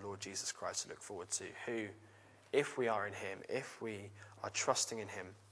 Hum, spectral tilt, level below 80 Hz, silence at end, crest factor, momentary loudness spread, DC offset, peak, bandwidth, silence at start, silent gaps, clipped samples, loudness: none; -2.5 dB/octave; -82 dBFS; 0 s; 24 dB; 13 LU; under 0.1%; -18 dBFS; 11 kHz; 0 s; none; under 0.1%; -40 LUFS